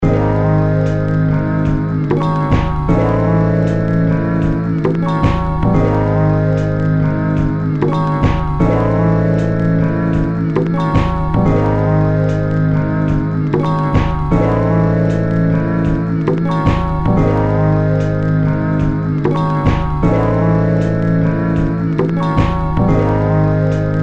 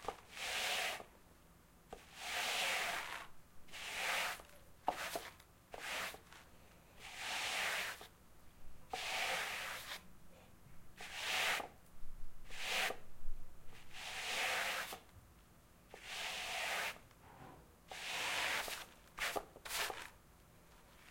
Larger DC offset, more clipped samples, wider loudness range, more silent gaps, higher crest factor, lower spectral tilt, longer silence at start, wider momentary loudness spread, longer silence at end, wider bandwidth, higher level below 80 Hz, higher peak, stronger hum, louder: neither; neither; second, 0 LU vs 3 LU; neither; second, 14 dB vs 22 dB; first, -9.5 dB/octave vs -0.5 dB/octave; about the same, 0 s vs 0 s; second, 3 LU vs 22 LU; about the same, 0 s vs 0 s; second, 7 kHz vs 16.5 kHz; first, -26 dBFS vs -58 dBFS; first, 0 dBFS vs -22 dBFS; neither; first, -15 LUFS vs -41 LUFS